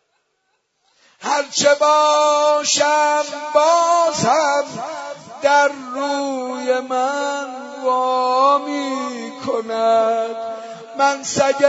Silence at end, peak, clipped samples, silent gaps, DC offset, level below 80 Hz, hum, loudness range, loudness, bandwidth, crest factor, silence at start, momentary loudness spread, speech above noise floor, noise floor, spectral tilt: 0 s; -2 dBFS; under 0.1%; none; under 0.1%; -66 dBFS; none; 5 LU; -17 LUFS; 8 kHz; 16 dB; 1.2 s; 13 LU; 51 dB; -69 dBFS; -2.5 dB/octave